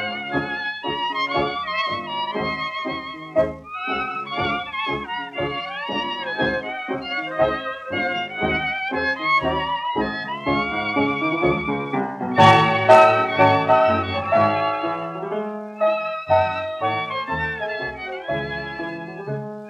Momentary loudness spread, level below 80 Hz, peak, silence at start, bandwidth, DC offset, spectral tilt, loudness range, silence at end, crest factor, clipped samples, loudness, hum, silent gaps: 12 LU; -50 dBFS; 0 dBFS; 0 s; 11 kHz; under 0.1%; -6 dB/octave; 9 LU; 0 s; 20 dB; under 0.1%; -21 LUFS; none; none